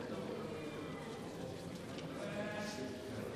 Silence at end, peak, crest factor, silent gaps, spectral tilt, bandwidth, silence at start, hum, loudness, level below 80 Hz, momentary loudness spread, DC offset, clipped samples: 0 s; -30 dBFS; 14 dB; none; -5.5 dB/octave; 15 kHz; 0 s; none; -45 LUFS; -70 dBFS; 4 LU; under 0.1%; under 0.1%